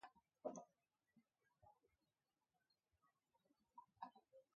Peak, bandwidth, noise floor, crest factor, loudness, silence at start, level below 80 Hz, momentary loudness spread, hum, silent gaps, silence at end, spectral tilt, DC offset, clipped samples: -36 dBFS; 6.6 kHz; under -90 dBFS; 28 dB; -58 LUFS; 0 s; under -90 dBFS; 14 LU; none; none; 0.15 s; -5 dB/octave; under 0.1%; under 0.1%